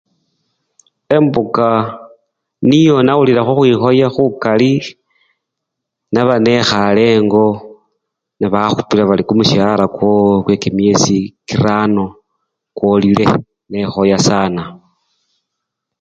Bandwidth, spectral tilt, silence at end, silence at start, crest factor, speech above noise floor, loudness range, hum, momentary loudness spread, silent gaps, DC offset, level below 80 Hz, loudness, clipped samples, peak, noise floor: 9 kHz; -6 dB/octave; 1.25 s; 1.1 s; 14 dB; 66 dB; 3 LU; none; 9 LU; none; under 0.1%; -46 dBFS; -12 LUFS; under 0.1%; 0 dBFS; -78 dBFS